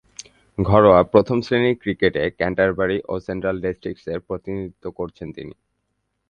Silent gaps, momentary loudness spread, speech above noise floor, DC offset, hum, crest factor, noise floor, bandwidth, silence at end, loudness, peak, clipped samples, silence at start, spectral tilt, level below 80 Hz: none; 20 LU; 54 dB; under 0.1%; none; 20 dB; -73 dBFS; 9.4 kHz; 0.8 s; -20 LUFS; 0 dBFS; under 0.1%; 0.6 s; -7 dB/octave; -44 dBFS